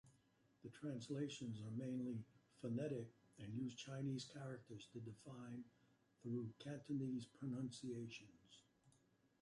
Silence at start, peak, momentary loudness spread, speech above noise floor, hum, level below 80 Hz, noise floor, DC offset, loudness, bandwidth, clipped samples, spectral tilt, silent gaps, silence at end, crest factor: 0.05 s; -34 dBFS; 13 LU; 29 dB; none; -84 dBFS; -78 dBFS; under 0.1%; -50 LUFS; 11.5 kHz; under 0.1%; -6.5 dB/octave; none; 0.5 s; 16 dB